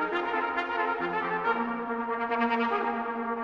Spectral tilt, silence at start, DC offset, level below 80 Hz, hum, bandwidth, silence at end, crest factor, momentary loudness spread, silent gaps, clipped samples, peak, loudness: -6.5 dB/octave; 0 s; under 0.1%; -66 dBFS; none; 7 kHz; 0 s; 16 dB; 5 LU; none; under 0.1%; -14 dBFS; -29 LUFS